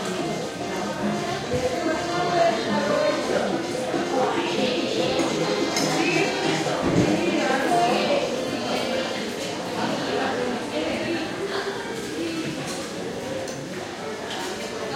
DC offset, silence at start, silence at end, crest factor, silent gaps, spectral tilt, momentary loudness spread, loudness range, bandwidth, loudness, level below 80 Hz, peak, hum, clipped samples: under 0.1%; 0 s; 0 s; 18 dB; none; -4 dB/octave; 9 LU; 6 LU; 16.5 kHz; -25 LUFS; -56 dBFS; -8 dBFS; none; under 0.1%